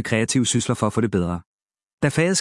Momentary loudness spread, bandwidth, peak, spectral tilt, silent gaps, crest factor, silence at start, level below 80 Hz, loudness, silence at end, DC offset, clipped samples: 6 LU; 12 kHz; -4 dBFS; -4.5 dB/octave; 1.46-1.66 s, 1.93-1.98 s; 18 dB; 0 s; -54 dBFS; -21 LUFS; 0 s; under 0.1%; under 0.1%